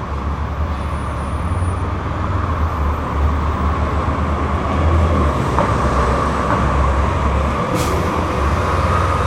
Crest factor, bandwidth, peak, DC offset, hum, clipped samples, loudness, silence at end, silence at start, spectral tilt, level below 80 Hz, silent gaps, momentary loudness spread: 16 dB; 13.5 kHz; 0 dBFS; under 0.1%; none; under 0.1%; -18 LUFS; 0 s; 0 s; -7 dB/octave; -22 dBFS; none; 6 LU